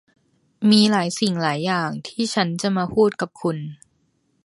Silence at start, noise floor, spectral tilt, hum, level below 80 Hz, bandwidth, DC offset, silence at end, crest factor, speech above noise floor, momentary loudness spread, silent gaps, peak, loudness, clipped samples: 0.6 s; -66 dBFS; -5 dB/octave; none; -60 dBFS; 11.5 kHz; under 0.1%; 0.7 s; 18 dB; 46 dB; 11 LU; none; -2 dBFS; -21 LUFS; under 0.1%